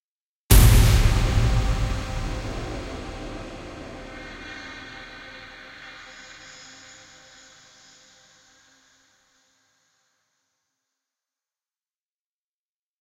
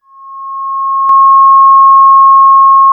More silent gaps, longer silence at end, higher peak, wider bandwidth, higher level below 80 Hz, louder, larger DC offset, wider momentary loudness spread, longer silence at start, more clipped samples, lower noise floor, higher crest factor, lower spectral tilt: neither; first, 7 s vs 0 s; about the same, 0 dBFS vs 0 dBFS; first, 16 kHz vs 1.5 kHz; first, -28 dBFS vs -72 dBFS; second, -22 LUFS vs -4 LUFS; neither; first, 25 LU vs 14 LU; first, 0.5 s vs 0.25 s; neither; first, under -90 dBFS vs -27 dBFS; first, 24 dB vs 6 dB; about the same, -4.5 dB/octave vs -3.5 dB/octave